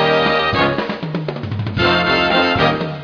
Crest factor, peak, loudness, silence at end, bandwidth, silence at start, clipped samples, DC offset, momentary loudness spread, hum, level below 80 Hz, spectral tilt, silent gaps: 16 dB; 0 dBFS; -16 LUFS; 0 s; 5.4 kHz; 0 s; under 0.1%; under 0.1%; 10 LU; none; -40 dBFS; -6.5 dB/octave; none